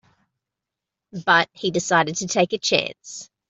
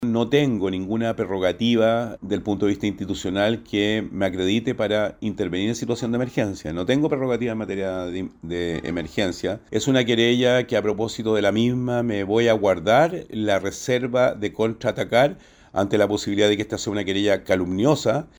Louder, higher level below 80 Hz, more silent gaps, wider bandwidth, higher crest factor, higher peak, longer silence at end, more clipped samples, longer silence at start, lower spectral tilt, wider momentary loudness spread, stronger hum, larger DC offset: about the same, -21 LUFS vs -22 LUFS; second, -64 dBFS vs -52 dBFS; neither; second, 8.2 kHz vs over 20 kHz; about the same, 20 dB vs 18 dB; about the same, -2 dBFS vs -4 dBFS; about the same, 0.25 s vs 0.15 s; neither; first, 1.15 s vs 0 s; second, -3 dB/octave vs -5.5 dB/octave; first, 17 LU vs 8 LU; neither; neither